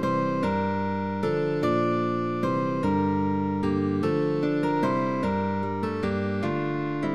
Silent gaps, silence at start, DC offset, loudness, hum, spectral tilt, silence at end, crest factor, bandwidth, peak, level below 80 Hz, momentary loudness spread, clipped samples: none; 0 s; 0.5%; -26 LUFS; none; -8 dB/octave; 0 s; 14 dB; 11 kHz; -12 dBFS; -56 dBFS; 4 LU; under 0.1%